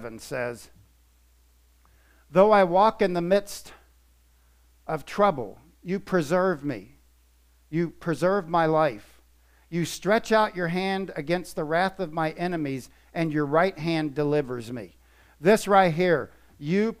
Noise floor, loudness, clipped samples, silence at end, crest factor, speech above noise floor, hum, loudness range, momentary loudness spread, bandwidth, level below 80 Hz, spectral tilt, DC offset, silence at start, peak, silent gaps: -60 dBFS; -25 LUFS; under 0.1%; 0.05 s; 20 dB; 36 dB; none; 4 LU; 17 LU; 15.5 kHz; -56 dBFS; -6 dB/octave; under 0.1%; 0 s; -6 dBFS; none